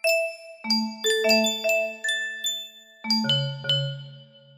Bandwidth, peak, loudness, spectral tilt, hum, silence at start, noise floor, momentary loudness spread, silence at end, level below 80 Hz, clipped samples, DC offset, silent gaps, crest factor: 15.5 kHz; -8 dBFS; -24 LUFS; -3 dB/octave; none; 0.05 s; -47 dBFS; 17 LU; 0.35 s; -74 dBFS; under 0.1%; under 0.1%; none; 18 dB